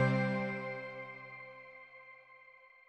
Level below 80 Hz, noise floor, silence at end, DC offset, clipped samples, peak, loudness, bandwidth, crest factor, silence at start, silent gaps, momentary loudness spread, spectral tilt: -80 dBFS; -60 dBFS; 0.2 s; under 0.1%; under 0.1%; -18 dBFS; -38 LUFS; 8.4 kHz; 22 dB; 0 s; none; 23 LU; -8 dB/octave